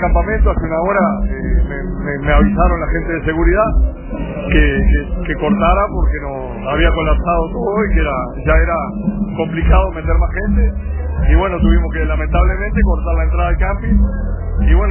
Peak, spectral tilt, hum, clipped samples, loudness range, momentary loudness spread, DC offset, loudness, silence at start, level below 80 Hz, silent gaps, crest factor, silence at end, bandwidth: 0 dBFS; -11 dB/octave; none; under 0.1%; 1 LU; 7 LU; under 0.1%; -16 LUFS; 0 s; -16 dBFS; none; 14 dB; 0 s; 3.2 kHz